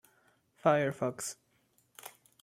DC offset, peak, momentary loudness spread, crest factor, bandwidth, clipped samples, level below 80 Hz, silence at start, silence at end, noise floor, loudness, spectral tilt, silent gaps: under 0.1%; -12 dBFS; 22 LU; 24 dB; 16.5 kHz; under 0.1%; -78 dBFS; 0.65 s; 0.35 s; -72 dBFS; -32 LUFS; -5 dB/octave; none